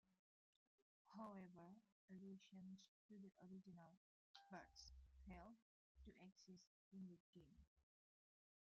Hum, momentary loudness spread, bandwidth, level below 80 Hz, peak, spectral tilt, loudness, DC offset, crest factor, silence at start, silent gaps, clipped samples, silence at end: none; 8 LU; 7.2 kHz; -78 dBFS; -46 dBFS; -5.5 dB/octave; -64 LUFS; under 0.1%; 20 dB; 0.05 s; 0.19-1.05 s, 1.92-2.08 s, 2.88-3.09 s, 3.97-4.34 s, 5.62-5.95 s, 6.67-6.91 s, 7.20-7.33 s, 7.67-7.76 s; under 0.1%; 0.8 s